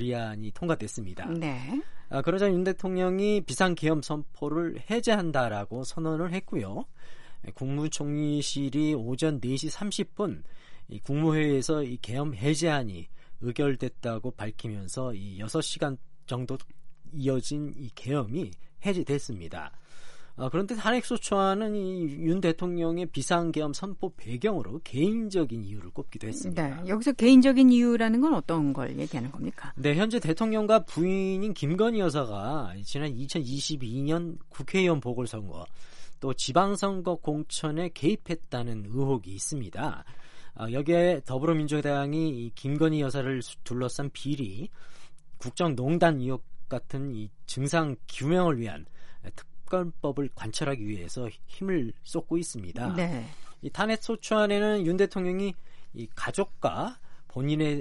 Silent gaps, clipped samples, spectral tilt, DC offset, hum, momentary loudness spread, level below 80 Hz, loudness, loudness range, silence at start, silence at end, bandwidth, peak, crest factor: none; under 0.1%; -6 dB/octave; under 0.1%; none; 13 LU; -52 dBFS; -29 LUFS; 8 LU; 0 s; 0 s; 11.5 kHz; -8 dBFS; 20 dB